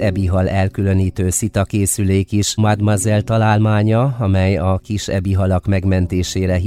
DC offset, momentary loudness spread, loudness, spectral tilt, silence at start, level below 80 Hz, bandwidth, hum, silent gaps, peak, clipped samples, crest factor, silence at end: under 0.1%; 4 LU; -16 LUFS; -6 dB/octave; 0 s; -36 dBFS; 15 kHz; none; none; -4 dBFS; under 0.1%; 12 dB; 0 s